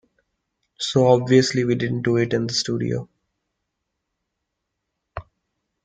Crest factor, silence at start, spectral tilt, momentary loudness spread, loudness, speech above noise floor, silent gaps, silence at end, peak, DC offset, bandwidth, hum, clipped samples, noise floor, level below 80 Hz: 20 dB; 0.8 s; -5.5 dB/octave; 22 LU; -20 LUFS; 60 dB; none; 0.65 s; -2 dBFS; under 0.1%; 9.4 kHz; none; under 0.1%; -79 dBFS; -56 dBFS